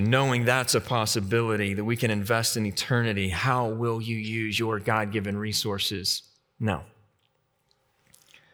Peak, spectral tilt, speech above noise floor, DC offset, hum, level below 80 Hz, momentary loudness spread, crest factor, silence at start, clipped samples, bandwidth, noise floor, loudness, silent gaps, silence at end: -6 dBFS; -4.5 dB/octave; 45 dB; under 0.1%; none; -60 dBFS; 7 LU; 20 dB; 0 s; under 0.1%; over 20 kHz; -71 dBFS; -26 LUFS; none; 1.65 s